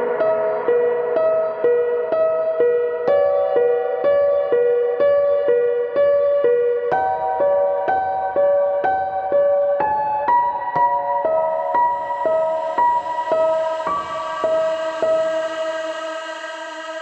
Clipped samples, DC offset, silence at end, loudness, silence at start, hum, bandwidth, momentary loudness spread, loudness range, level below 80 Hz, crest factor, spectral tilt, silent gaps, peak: under 0.1%; under 0.1%; 0 s; -19 LUFS; 0 s; none; 8.4 kHz; 6 LU; 3 LU; -62 dBFS; 12 dB; -4.5 dB/octave; none; -6 dBFS